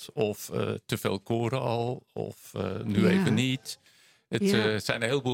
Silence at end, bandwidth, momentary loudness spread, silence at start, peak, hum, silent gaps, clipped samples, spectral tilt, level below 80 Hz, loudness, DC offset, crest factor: 0 s; 17 kHz; 12 LU; 0 s; -6 dBFS; none; none; under 0.1%; -5.5 dB/octave; -66 dBFS; -29 LUFS; under 0.1%; 22 dB